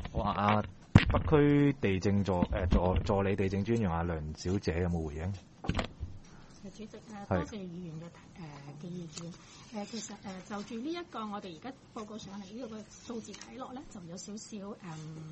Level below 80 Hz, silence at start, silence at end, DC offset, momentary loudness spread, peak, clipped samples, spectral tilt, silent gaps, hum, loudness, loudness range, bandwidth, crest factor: -44 dBFS; 0 s; 0 s; under 0.1%; 20 LU; -4 dBFS; under 0.1%; -6.5 dB/octave; none; none; -33 LUFS; 15 LU; 8.4 kHz; 30 dB